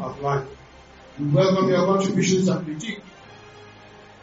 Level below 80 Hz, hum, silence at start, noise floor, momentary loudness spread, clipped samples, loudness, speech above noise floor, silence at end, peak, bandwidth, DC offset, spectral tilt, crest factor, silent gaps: -56 dBFS; none; 0 s; -47 dBFS; 16 LU; under 0.1%; -22 LUFS; 25 dB; 0.25 s; -8 dBFS; 7.8 kHz; under 0.1%; -6 dB/octave; 16 dB; none